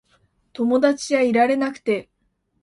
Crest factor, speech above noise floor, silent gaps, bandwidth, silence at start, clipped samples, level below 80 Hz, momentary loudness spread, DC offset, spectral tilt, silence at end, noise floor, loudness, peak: 16 dB; 50 dB; none; 11.5 kHz; 0.6 s; under 0.1%; -64 dBFS; 8 LU; under 0.1%; -4.5 dB/octave; 0.6 s; -69 dBFS; -20 LUFS; -4 dBFS